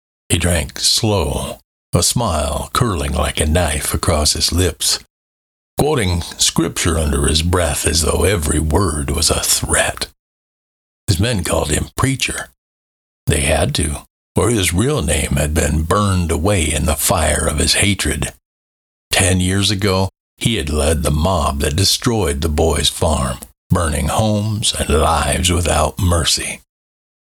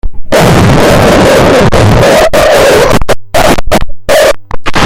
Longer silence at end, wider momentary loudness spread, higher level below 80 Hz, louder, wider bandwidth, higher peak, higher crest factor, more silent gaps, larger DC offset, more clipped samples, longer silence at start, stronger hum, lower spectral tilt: first, 0.7 s vs 0 s; about the same, 6 LU vs 7 LU; second, -26 dBFS vs -18 dBFS; second, -16 LUFS vs -6 LUFS; first, 19.5 kHz vs 17.5 kHz; about the same, -2 dBFS vs 0 dBFS; first, 16 dB vs 4 dB; first, 1.64-1.93 s, 5.10-5.77 s, 10.19-11.07 s, 12.58-13.27 s, 14.10-14.35 s, 18.45-19.11 s, 20.20-20.37 s, 23.57-23.70 s vs none; neither; second, under 0.1% vs 4%; first, 0.3 s vs 0.05 s; neither; second, -3.5 dB/octave vs -5 dB/octave